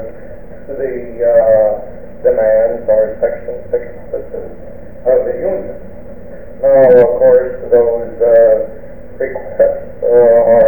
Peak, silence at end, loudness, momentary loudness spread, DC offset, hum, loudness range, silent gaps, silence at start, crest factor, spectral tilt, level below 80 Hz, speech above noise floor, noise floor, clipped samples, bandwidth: 0 dBFS; 0 s; -12 LUFS; 23 LU; 4%; none; 7 LU; none; 0 s; 12 dB; -9.5 dB/octave; -38 dBFS; 21 dB; -32 dBFS; under 0.1%; over 20 kHz